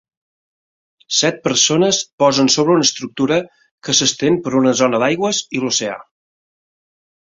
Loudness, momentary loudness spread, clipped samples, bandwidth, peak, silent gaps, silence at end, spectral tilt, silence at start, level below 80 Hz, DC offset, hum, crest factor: -15 LUFS; 7 LU; under 0.1%; 7.8 kHz; -2 dBFS; 2.13-2.18 s, 3.71-3.78 s; 1.35 s; -3 dB/octave; 1.1 s; -58 dBFS; under 0.1%; none; 16 dB